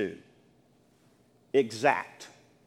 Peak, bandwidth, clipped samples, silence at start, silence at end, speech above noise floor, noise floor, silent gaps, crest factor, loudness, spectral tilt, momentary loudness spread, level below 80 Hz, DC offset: -8 dBFS; 13 kHz; under 0.1%; 0 s; 0.4 s; 36 dB; -64 dBFS; none; 24 dB; -28 LUFS; -4.5 dB/octave; 23 LU; -78 dBFS; under 0.1%